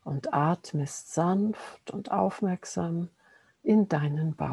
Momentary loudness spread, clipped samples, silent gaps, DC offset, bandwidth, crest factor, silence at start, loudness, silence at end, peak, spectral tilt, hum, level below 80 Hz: 10 LU; under 0.1%; none; under 0.1%; 12 kHz; 18 dB; 0.05 s; -29 LUFS; 0 s; -10 dBFS; -7 dB/octave; none; -66 dBFS